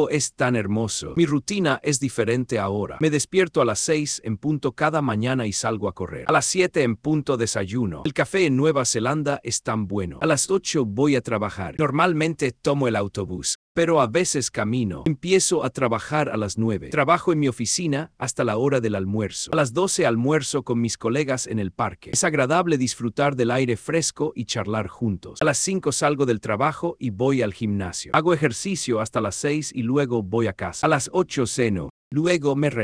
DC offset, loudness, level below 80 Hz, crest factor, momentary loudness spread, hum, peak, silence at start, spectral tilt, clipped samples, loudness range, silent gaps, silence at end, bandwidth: under 0.1%; -23 LUFS; -54 dBFS; 20 dB; 6 LU; none; -4 dBFS; 0 s; -4.5 dB/octave; under 0.1%; 1 LU; 13.55-13.75 s, 31.90-32.11 s; 0 s; 11 kHz